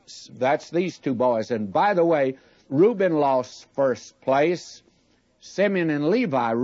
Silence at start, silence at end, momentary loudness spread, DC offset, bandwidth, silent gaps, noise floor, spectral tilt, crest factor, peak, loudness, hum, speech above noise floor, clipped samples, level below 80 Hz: 0.1 s; 0 s; 10 LU; under 0.1%; 7.8 kHz; none; -63 dBFS; -6.5 dB/octave; 14 dB; -8 dBFS; -23 LUFS; none; 41 dB; under 0.1%; -72 dBFS